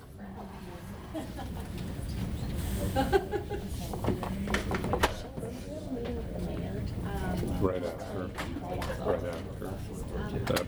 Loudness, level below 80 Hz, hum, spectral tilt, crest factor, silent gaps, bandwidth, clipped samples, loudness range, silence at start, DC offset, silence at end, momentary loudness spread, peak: -34 LUFS; -42 dBFS; none; -6 dB/octave; 22 dB; none; over 20 kHz; under 0.1%; 3 LU; 0 s; under 0.1%; 0 s; 10 LU; -10 dBFS